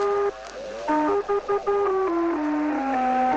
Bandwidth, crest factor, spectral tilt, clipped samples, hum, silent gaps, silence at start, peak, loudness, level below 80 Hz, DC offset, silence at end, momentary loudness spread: 8.2 kHz; 12 dB; -5.5 dB/octave; under 0.1%; none; none; 0 s; -12 dBFS; -24 LUFS; -54 dBFS; under 0.1%; 0 s; 6 LU